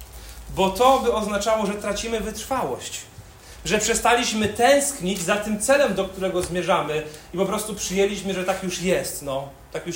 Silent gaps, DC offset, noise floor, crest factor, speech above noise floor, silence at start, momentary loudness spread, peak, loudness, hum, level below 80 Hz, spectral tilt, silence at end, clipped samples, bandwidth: none; under 0.1%; -43 dBFS; 20 dB; 21 dB; 0 s; 14 LU; -2 dBFS; -22 LUFS; none; -44 dBFS; -3.5 dB/octave; 0 s; under 0.1%; 16.5 kHz